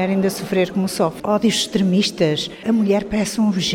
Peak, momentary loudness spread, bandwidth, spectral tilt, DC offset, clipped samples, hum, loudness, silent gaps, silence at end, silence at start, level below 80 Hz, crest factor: -4 dBFS; 3 LU; 16.5 kHz; -5 dB/octave; under 0.1%; under 0.1%; none; -19 LUFS; none; 0 s; 0 s; -48 dBFS; 14 dB